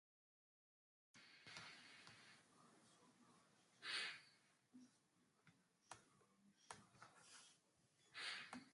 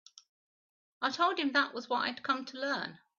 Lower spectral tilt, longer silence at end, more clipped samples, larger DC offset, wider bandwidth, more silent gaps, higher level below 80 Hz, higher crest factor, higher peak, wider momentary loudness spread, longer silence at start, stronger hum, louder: about the same, -1 dB/octave vs 0 dB/octave; second, 0 s vs 0.25 s; neither; neither; first, 11.5 kHz vs 7.2 kHz; neither; second, under -90 dBFS vs -82 dBFS; first, 26 dB vs 20 dB; second, -34 dBFS vs -14 dBFS; first, 19 LU vs 6 LU; first, 1.15 s vs 1 s; neither; second, -55 LUFS vs -32 LUFS